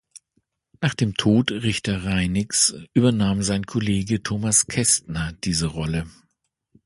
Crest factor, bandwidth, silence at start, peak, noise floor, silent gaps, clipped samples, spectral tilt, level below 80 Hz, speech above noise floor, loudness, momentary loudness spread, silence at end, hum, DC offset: 18 dB; 11.5 kHz; 0.8 s; -4 dBFS; -74 dBFS; none; under 0.1%; -4 dB/octave; -42 dBFS; 52 dB; -21 LUFS; 8 LU; 0.75 s; none; under 0.1%